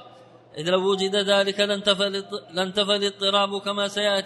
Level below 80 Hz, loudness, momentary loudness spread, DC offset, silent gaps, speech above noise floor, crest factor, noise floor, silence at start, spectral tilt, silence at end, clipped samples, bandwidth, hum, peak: -70 dBFS; -23 LUFS; 8 LU; under 0.1%; none; 26 dB; 18 dB; -49 dBFS; 0 s; -3.5 dB/octave; 0 s; under 0.1%; 11.5 kHz; none; -6 dBFS